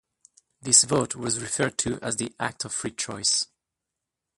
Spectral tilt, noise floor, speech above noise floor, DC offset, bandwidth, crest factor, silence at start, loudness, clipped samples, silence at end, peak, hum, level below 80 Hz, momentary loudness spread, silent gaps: -2 dB/octave; -86 dBFS; 60 dB; under 0.1%; 11.5 kHz; 26 dB; 0.65 s; -24 LUFS; under 0.1%; 0.95 s; -2 dBFS; none; -58 dBFS; 13 LU; none